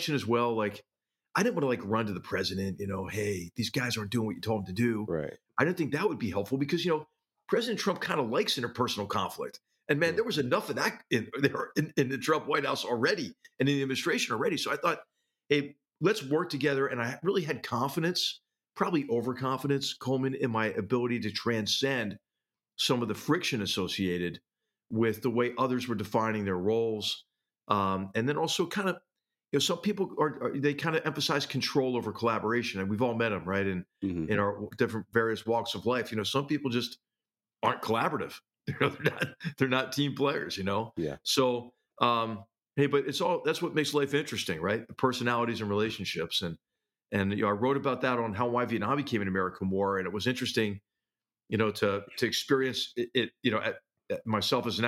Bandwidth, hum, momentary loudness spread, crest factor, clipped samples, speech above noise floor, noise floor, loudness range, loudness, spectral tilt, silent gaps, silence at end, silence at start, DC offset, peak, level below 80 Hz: 16.5 kHz; none; 6 LU; 22 dB; under 0.1%; over 60 dB; under -90 dBFS; 2 LU; -30 LUFS; -5 dB/octave; none; 0 s; 0 s; under 0.1%; -8 dBFS; -68 dBFS